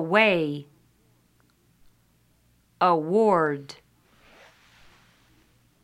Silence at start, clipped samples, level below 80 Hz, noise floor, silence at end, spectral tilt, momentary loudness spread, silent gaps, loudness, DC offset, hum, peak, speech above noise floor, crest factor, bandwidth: 0 s; under 0.1%; -68 dBFS; -64 dBFS; 2.1 s; -6.5 dB/octave; 19 LU; none; -23 LUFS; under 0.1%; none; -4 dBFS; 42 dB; 22 dB; 12.5 kHz